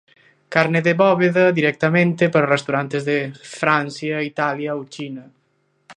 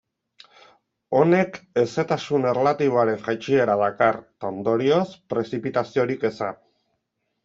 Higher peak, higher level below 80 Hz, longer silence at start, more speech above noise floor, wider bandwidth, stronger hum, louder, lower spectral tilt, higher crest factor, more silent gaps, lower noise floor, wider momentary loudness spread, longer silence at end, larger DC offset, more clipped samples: first, 0 dBFS vs -4 dBFS; about the same, -66 dBFS vs -66 dBFS; second, 0.5 s vs 1.1 s; second, 47 dB vs 54 dB; first, 10 kHz vs 7.6 kHz; neither; first, -18 LUFS vs -22 LUFS; about the same, -6.5 dB/octave vs -7 dB/octave; about the same, 20 dB vs 18 dB; neither; second, -65 dBFS vs -76 dBFS; first, 13 LU vs 8 LU; second, 0.05 s vs 0.9 s; neither; neither